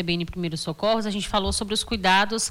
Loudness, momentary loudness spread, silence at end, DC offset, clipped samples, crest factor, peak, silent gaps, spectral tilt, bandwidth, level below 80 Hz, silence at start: -24 LUFS; 9 LU; 0 s; under 0.1%; under 0.1%; 14 dB; -10 dBFS; none; -3.5 dB/octave; 19 kHz; -40 dBFS; 0 s